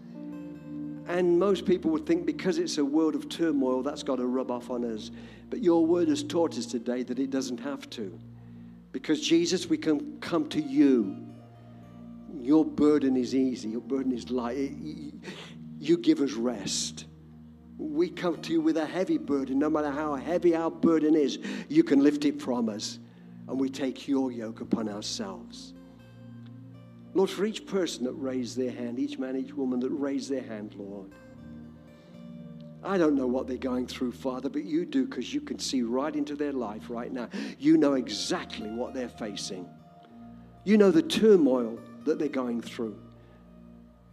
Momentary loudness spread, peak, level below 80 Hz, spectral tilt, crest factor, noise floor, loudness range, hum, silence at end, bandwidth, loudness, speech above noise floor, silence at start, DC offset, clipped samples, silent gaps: 21 LU; -8 dBFS; -62 dBFS; -5 dB/octave; 20 dB; -52 dBFS; 7 LU; none; 0.35 s; 13 kHz; -28 LUFS; 24 dB; 0 s; under 0.1%; under 0.1%; none